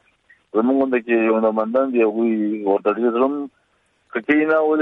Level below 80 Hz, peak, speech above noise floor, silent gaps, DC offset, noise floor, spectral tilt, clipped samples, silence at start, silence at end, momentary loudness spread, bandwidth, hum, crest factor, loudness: -70 dBFS; -6 dBFS; 46 dB; none; under 0.1%; -64 dBFS; -8.5 dB/octave; under 0.1%; 0.55 s; 0 s; 8 LU; 4 kHz; none; 14 dB; -19 LUFS